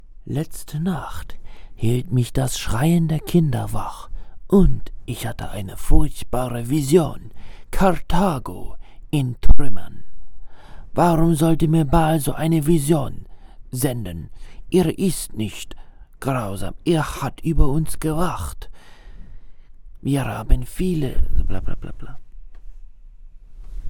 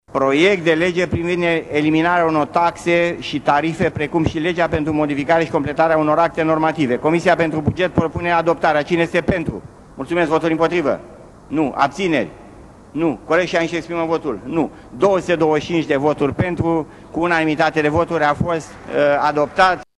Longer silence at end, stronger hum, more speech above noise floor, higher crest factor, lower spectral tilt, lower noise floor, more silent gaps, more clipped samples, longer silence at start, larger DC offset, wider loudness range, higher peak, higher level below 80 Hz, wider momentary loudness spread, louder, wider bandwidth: second, 0 s vs 0.15 s; neither; about the same, 23 dB vs 24 dB; about the same, 18 dB vs 16 dB; about the same, -6.5 dB/octave vs -6 dB/octave; about the same, -40 dBFS vs -41 dBFS; neither; neither; about the same, 0.1 s vs 0.15 s; neither; first, 7 LU vs 3 LU; about the same, 0 dBFS vs -2 dBFS; first, -26 dBFS vs -44 dBFS; first, 18 LU vs 7 LU; second, -22 LUFS vs -18 LUFS; first, 16.5 kHz vs 11.5 kHz